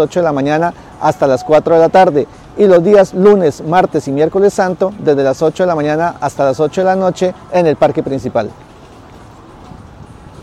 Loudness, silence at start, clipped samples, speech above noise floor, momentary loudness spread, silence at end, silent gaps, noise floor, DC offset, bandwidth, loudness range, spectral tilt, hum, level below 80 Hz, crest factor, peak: -12 LUFS; 0 s; under 0.1%; 25 dB; 8 LU; 0 s; none; -37 dBFS; under 0.1%; 12.5 kHz; 6 LU; -6.5 dB/octave; none; -46 dBFS; 12 dB; 0 dBFS